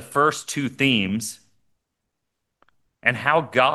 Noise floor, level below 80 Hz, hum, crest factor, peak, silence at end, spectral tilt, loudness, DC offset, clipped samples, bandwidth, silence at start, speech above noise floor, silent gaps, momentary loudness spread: -80 dBFS; -64 dBFS; none; 22 dB; -2 dBFS; 0 s; -4 dB/octave; -21 LUFS; under 0.1%; under 0.1%; 12.5 kHz; 0 s; 58 dB; none; 9 LU